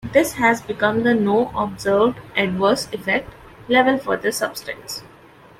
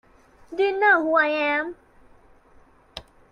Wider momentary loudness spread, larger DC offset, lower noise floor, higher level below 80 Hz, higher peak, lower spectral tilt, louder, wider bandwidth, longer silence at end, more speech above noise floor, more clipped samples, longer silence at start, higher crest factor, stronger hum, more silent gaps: second, 10 LU vs 24 LU; neither; second, -46 dBFS vs -54 dBFS; first, -50 dBFS vs -60 dBFS; first, -2 dBFS vs -6 dBFS; about the same, -4.5 dB/octave vs -4.5 dB/octave; about the same, -19 LUFS vs -21 LUFS; first, 16.5 kHz vs 9.8 kHz; first, 0.55 s vs 0.3 s; second, 27 dB vs 34 dB; neither; second, 0.05 s vs 0.5 s; about the same, 18 dB vs 18 dB; neither; neither